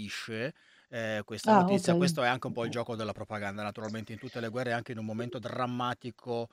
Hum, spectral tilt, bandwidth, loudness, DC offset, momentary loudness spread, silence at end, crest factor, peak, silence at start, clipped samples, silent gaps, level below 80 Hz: none; -5.5 dB/octave; 15 kHz; -32 LUFS; under 0.1%; 14 LU; 0.05 s; 22 dB; -10 dBFS; 0 s; under 0.1%; none; -72 dBFS